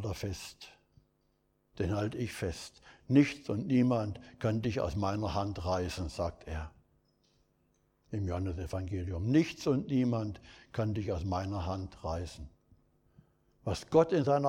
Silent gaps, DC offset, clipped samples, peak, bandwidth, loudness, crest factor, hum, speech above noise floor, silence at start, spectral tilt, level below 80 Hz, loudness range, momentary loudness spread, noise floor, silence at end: none; under 0.1%; under 0.1%; -12 dBFS; 16 kHz; -33 LUFS; 22 dB; none; 42 dB; 0 s; -7 dB/octave; -52 dBFS; 7 LU; 15 LU; -74 dBFS; 0 s